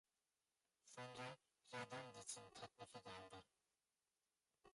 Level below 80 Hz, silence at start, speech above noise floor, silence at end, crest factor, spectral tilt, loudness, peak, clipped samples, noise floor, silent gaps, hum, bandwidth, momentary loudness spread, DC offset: -88 dBFS; 0.85 s; over 30 dB; 0.05 s; 22 dB; -3 dB/octave; -57 LUFS; -38 dBFS; under 0.1%; under -90 dBFS; none; none; 11.5 kHz; 10 LU; under 0.1%